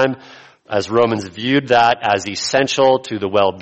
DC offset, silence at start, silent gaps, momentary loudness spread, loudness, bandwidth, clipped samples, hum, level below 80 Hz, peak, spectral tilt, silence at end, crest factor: under 0.1%; 0 s; none; 8 LU; -16 LUFS; 8.4 kHz; under 0.1%; none; -56 dBFS; -2 dBFS; -4 dB/octave; 0 s; 14 dB